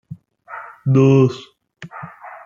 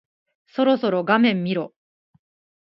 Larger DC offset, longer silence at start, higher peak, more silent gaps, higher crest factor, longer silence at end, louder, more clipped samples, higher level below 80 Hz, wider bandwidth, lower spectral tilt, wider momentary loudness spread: neither; second, 0.1 s vs 0.55 s; about the same, -2 dBFS vs -2 dBFS; neither; about the same, 16 dB vs 20 dB; second, 0.1 s vs 0.95 s; first, -15 LUFS vs -20 LUFS; neither; first, -60 dBFS vs -74 dBFS; first, 7.2 kHz vs 5.8 kHz; about the same, -8.5 dB/octave vs -9 dB/octave; first, 23 LU vs 13 LU